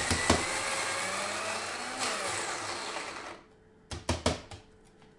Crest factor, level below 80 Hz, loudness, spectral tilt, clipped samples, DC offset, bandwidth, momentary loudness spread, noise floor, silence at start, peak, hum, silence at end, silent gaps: 26 dB; -52 dBFS; -32 LUFS; -2.5 dB/octave; under 0.1%; under 0.1%; 11.5 kHz; 17 LU; -59 dBFS; 0 s; -8 dBFS; none; 0.1 s; none